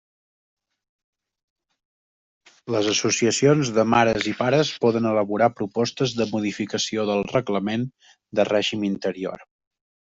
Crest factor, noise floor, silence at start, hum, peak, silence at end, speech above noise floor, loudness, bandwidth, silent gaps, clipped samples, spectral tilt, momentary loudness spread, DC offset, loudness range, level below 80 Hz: 20 dB; under -90 dBFS; 2.65 s; none; -4 dBFS; 0.6 s; over 68 dB; -22 LUFS; 8.2 kHz; none; under 0.1%; -4.5 dB/octave; 9 LU; under 0.1%; 5 LU; -60 dBFS